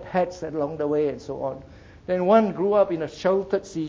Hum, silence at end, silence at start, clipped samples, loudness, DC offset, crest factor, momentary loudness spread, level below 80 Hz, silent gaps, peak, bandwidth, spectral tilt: none; 0 s; 0 s; under 0.1%; -24 LUFS; under 0.1%; 18 dB; 12 LU; -54 dBFS; none; -4 dBFS; 8 kHz; -7 dB/octave